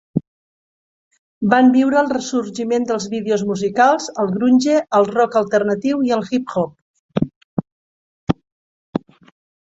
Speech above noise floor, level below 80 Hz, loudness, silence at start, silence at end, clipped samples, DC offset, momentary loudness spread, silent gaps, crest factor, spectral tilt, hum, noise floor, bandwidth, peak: over 74 dB; -54 dBFS; -18 LUFS; 0.15 s; 0.65 s; under 0.1%; under 0.1%; 14 LU; 0.27-1.11 s, 1.18-1.41 s, 6.82-7.09 s, 7.36-7.57 s, 7.72-8.27 s, 8.52-8.93 s; 16 dB; -6 dB/octave; none; under -90 dBFS; 7.8 kHz; -2 dBFS